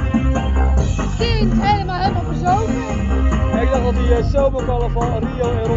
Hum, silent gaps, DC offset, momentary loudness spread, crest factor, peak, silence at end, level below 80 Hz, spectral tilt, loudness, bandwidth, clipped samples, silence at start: none; none; under 0.1%; 4 LU; 14 dB; -2 dBFS; 0 s; -20 dBFS; -6.5 dB/octave; -18 LUFS; 7.8 kHz; under 0.1%; 0 s